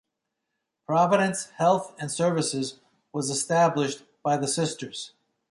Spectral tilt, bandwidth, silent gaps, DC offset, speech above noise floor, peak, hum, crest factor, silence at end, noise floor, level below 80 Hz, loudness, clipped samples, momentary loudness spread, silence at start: -4.5 dB/octave; 11.5 kHz; none; under 0.1%; 57 dB; -8 dBFS; none; 18 dB; 0.4 s; -82 dBFS; -72 dBFS; -25 LUFS; under 0.1%; 13 LU; 0.9 s